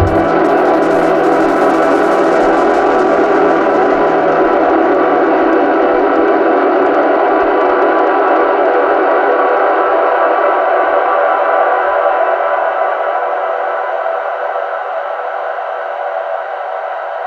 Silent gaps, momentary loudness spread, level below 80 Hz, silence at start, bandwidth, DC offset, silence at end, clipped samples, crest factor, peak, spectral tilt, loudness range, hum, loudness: none; 8 LU; -42 dBFS; 0 s; 10.5 kHz; under 0.1%; 0 s; under 0.1%; 12 dB; 0 dBFS; -6.5 dB/octave; 6 LU; none; -12 LUFS